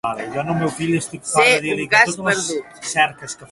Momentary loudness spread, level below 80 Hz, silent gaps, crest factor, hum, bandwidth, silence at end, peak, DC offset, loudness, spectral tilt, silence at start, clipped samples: 11 LU; -56 dBFS; none; 20 dB; none; 12 kHz; 0.05 s; 0 dBFS; under 0.1%; -18 LUFS; -3.5 dB/octave; 0.05 s; under 0.1%